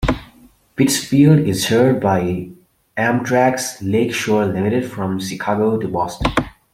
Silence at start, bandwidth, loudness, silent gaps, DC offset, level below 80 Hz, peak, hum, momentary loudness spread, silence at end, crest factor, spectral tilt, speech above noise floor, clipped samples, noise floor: 0 s; 16.5 kHz; -17 LUFS; none; under 0.1%; -38 dBFS; -2 dBFS; none; 10 LU; 0.25 s; 16 dB; -5.5 dB/octave; 32 dB; under 0.1%; -48 dBFS